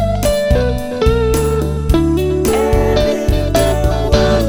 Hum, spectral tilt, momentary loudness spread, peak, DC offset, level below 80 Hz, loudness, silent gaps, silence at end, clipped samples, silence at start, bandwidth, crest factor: none; -6 dB/octave; 3 LU; 0 dBFS; under 0.1%; -18 dBFS; -15 LUFS; none; 0 s; under 0.1%; 0 s; 18 kHz; 12 dB